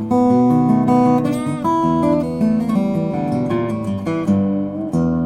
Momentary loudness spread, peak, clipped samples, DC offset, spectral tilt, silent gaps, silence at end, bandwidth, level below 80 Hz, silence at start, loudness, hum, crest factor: 7 LU; -4 dBFS; under 0.1%; under 0.1%; -8.5 dB/octave; none; 0 s; 11 kHz; -46 dBFS; 0 s; -17 LUFS; none; 14 dB